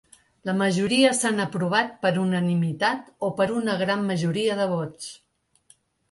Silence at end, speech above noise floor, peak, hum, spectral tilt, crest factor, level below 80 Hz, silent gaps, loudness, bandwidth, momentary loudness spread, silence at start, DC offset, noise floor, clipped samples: 0.95 s; 37 dB; -6 dBFS; none; -5 dB/octave; 18 dB; -64 dBFS; none; -24 LUFS; 11.5 kHz; 10 LU; 0.45 s; under 0.1%; -60 dBFS; under 0.1%